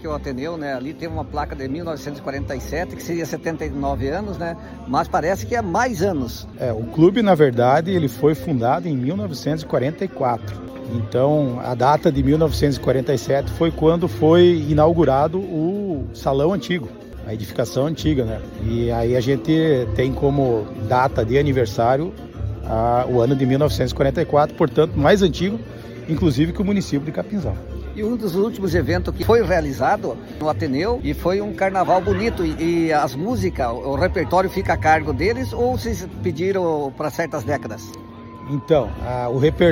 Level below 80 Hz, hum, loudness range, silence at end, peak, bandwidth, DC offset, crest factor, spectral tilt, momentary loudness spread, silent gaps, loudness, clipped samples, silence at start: -36 dBFS; none; 6 LU; 0 s; -2 dBFS; 16.5 kHz; under 0.1%; 18 dB; -7 dB/octave; 11 LU; none; -20 LUFS; under 0.1%; 0 s